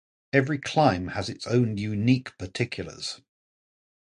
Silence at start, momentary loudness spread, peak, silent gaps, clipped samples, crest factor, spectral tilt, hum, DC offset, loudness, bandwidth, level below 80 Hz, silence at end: 0.35 s; 12 LU; -4 dBFS; none; under 0.1%; 22 dB; -6 dB/octave; none; under 0.1%; -26 LUFS; 11 kHz; -52 dBFS; 0.95 s